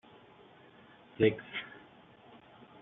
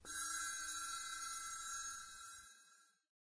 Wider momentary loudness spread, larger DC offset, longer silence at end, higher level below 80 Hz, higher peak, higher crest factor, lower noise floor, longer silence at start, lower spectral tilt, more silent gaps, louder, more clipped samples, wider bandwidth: first, 27 LU vs 14 LU; neither; first, 1.15 s vs 0.3 s; first, -70 dBFS vs -76 dBFS; first, -12 dBFS vs -32 dBFS; first, 26 dB vs 16 dB; second, -58 dBFS vs -70 dBFS; first, 1.2 s vs 0 s; first, -5 dB/octave vs 2.5 dB/octave; neither; first, -32 LUFS vs -44 LUFS; neither; second, 4 kHz vs 11 kHz